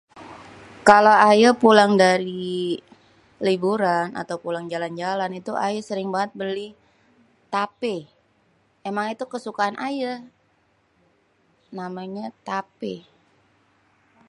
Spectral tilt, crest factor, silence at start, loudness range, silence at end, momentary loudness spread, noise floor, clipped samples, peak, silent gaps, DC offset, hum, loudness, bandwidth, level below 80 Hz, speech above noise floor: -5 dB/octave; 22 dB; 0.15 s; 17 LU; 1.3 s; 20 LU; -64 dBFS; under 0.1%; 0 dBFS; none; under 0.1%; none; -21 LUFS; 11.5 kHz; -68 dBFS; 43 dB